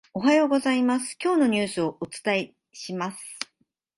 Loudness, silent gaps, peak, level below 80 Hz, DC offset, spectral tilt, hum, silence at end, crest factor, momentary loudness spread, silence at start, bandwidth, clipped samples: -24 LUFS; none; -8 dBFS; -68 dBFS; under 0.1%; -4.5 dB/octave; none; 0.55 s; 18 dB; 15 LU; 0.15 s; 11.5 kHz; under 0.1%